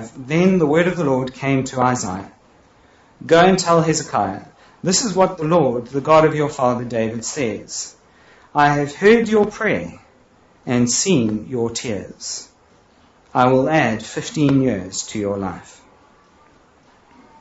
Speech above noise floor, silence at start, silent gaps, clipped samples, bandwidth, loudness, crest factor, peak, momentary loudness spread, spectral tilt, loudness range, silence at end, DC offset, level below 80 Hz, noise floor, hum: 35 dB; 0 s; none; under 0.1%; 8.2 kHz; -18 LUFS; 18 dB; -2 dBFS; 14 LU; -5 dB/octave; 4 LU; 1.8 s; under 0.1%; -52 dBFS; -53 dBFS; none